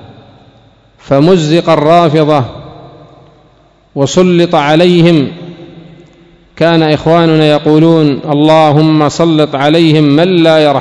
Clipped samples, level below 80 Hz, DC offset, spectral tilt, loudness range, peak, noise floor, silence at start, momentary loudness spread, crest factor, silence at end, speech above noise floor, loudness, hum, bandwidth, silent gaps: 3%; -44 dBFS; under 0.1%; -6.5 dB/octave; 3 LU; 0 dBFS; -46 dBFS; 1.05 s; 7 LU; 8 dB; 0 s; 39 dB; -8 LUFS; none; 11 kHz; none